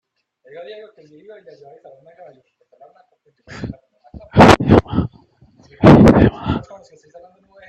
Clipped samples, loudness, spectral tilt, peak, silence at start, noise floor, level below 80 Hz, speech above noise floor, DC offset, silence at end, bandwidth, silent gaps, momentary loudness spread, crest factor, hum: under 0.1%; -12 LUFS; -7 dB/octave; 0 dBFS; 0.55 s; -51 dBFS; -36 dBFS; 12 dB; under 0.1%; 1.1 s; 13 kHz; none; 24 LU; 16 dB; none